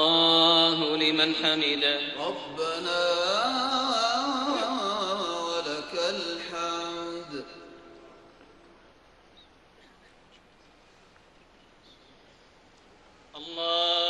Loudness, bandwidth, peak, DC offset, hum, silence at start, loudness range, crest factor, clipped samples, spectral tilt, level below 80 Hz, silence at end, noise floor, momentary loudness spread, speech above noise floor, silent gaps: -25 LUFS; 12 kHz; -8 dBFS; under 0.1%; none; 0 s; 16 LU; 22 dB; under 0.1%; -2.5 dB/octave; -66 dBFS; 0 s; -58 dBFS; 16 LU; 30 dB; none